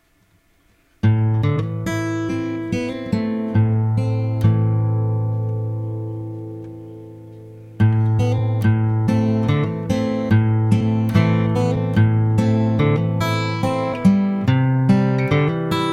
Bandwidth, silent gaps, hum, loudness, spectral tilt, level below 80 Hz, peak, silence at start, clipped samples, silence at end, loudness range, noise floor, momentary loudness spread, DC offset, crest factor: 8 kHz; none; none; -19 LUFS; -8 dB/octave; -44 dBFS; -2 dBFS; 1.05 s; under 0.1%; 0 s; 5 LU; -59 dBFS; 11 LU; under 0.1%; 16 dB